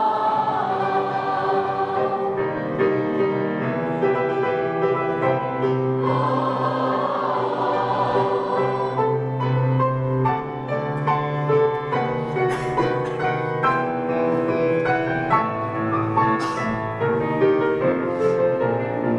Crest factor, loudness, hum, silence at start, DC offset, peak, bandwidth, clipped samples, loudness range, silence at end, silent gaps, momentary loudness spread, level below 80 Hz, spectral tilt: 16 dB; -22 LUFS; none; 0 s; under 0.1%; -6 dBFS; 10.5 kHz; under 0.1%; 1 LU; 0 s; none; 4 LU; -54 dBFS; -8 dB/octave